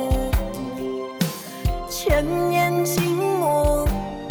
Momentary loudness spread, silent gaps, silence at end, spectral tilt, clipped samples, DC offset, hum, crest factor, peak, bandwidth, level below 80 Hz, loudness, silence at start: 9 LU; none; 0 s; -5.5 dB/octave; under 0.1%; under 0.1%; none; 16 dB; -6 dBFS; over 20 kHz; -30 dBFS; -23 LUFS; 0 s